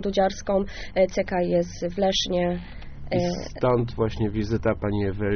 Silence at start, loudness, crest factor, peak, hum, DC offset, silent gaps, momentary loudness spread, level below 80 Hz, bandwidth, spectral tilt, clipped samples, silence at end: 0 s; -25 LUFS; 16 dB; -8 dBFS; none; under 0.1%; none; 6 LU; -40 dBFS; 6.6 kHz; -5 dB/octave; under 0.1%; 0 s